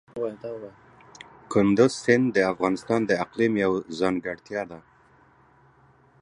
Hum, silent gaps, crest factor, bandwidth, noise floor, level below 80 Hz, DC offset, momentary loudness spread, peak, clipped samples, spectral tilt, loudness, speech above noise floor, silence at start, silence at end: none; none; 22 dB; 11 kHz; -58 dBFS; -60 dBFS; under 0.1%; 18 LU; -4 dBFS; under 0.1%; -6 dB/octave; -24 LUFS; 34 dB; 0.15 s; 1.45 s